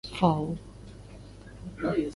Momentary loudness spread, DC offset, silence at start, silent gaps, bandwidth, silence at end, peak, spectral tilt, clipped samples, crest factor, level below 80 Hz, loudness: 22 LU; under 0.1%; 0.05 s; none; 11.5 kHz; 0 s; -10 dBFS; -7.5 dB/octave; under 0.1%; 22 dB; -50 dBFS; -29 LUFS